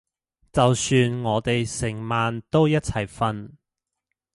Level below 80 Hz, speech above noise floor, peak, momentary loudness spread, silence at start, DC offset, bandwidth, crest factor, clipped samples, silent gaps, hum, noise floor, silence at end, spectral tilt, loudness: -48 dBFS; 62 dB; -4 dBFS; 8 LU; 0.55 s; under 0.1%; 11.5 kHz; 18 dB; under 0.1%; none; none; -84 dBFS; 0.85 s; -5.5 dB/octave; -23 LUFS